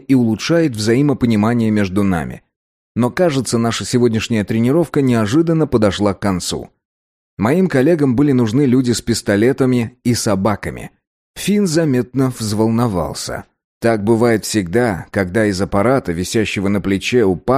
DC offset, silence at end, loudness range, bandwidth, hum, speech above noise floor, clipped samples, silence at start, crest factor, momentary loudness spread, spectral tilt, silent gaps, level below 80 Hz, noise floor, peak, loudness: under 0.1%; 0 s; 2 LU; 15.5 kHz; none; over 75 dB; under 0.1%; 0.1 s; 12 dB; 7 LU; -6 dB/octave; 2.56-2.95 s, 6.85-7.37 s, 11.07-11.34 s, 13.64-13.81 s; -42 dBFS; under -90 dBFS; -2 dBFS; -16 LUFS